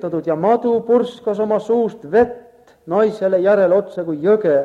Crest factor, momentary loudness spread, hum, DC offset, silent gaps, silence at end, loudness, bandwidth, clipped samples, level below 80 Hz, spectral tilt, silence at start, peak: 14 dB; 7 LU; none; under 0.1%; none; 0 s; -17 LUFS; 7.8 kHz; under 0.1%; -56 dBFS; -8 dB/octave; 0 s; -4 dBFS